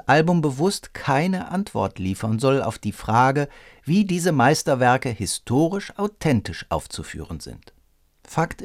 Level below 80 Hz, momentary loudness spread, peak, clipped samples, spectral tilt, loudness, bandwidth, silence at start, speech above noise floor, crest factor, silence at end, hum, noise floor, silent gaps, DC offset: -48 dBFS; 13 LU; -2 dBFS; under 0.1%; -5.5 dB/octave; -22 LUFS; 16 kHz; 0.05 s; 38 dB; 20 dB; 0 s; none; -60 dBFS; none; under 0.1%